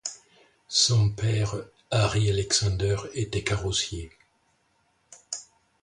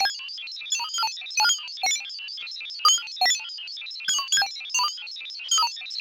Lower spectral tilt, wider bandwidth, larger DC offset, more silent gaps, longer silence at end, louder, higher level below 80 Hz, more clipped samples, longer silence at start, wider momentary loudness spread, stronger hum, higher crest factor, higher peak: first, -3.5 dB/octave vs 5 dB/octave; second, 11 kHz vs 17 kHz; neither; neither; first, 0.4 s vs 0 s; about the same, -26 LUFS vs -24 LUFS; first, -44 dBFS vs -78 dBFS; neither; about the same, 0.05 s vs 0 s; about the same, 15 LU vs 13 LU; neither; about the same, 20 dB vs 20 dB; about the same, -8 dBFS vs -6 dBFS